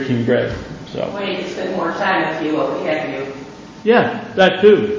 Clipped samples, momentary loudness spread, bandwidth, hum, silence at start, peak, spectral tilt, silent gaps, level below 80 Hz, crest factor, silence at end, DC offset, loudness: under 0.1%; 15 LU; 7.4 kHz; none; 0 s; 0 dBFS; -6 dB/octave; none; -48 dBFS; 16 dB; 0 s; under 0.1%; -17 LUFS